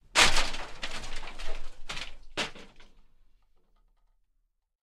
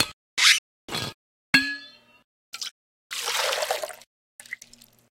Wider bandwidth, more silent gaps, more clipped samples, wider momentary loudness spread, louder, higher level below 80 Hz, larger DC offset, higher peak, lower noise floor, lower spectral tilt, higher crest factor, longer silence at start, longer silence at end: second, 13 kHz vs 17 kHz; second, none vs 0.13-0.37 s, 0.58-0.88 s, 1.14-1.53 s, 2.24-2.53 s, 2.71-3.10 s, 4.07-4.39 s; neither; about the same, 20 LU vs 22 LU; second, -29 LUFS vs -24 LUFS; first, -38 dBFS vs -64 dBFS; neither; second, -6 dBFS vs -2 dBFS; first, -75 dBFS vs -52 dBFS; about the same, -1 dB/octave vs -0.5 dB/octave; about the same, 24 dB vs 28 dB; first, 0.15 s vs 0 s; first, 2.05 s vs 0.55 s